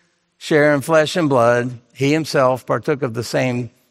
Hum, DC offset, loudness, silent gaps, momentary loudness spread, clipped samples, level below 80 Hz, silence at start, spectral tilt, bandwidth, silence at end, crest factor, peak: none; under 0.1%; -17 LUFS; none; 7 LU; under 0.1%; -60 dBFS; 0.4 s; -5.5 dB/octave; 16 kHz; 0.2 s; 16 dB; -2 dBFS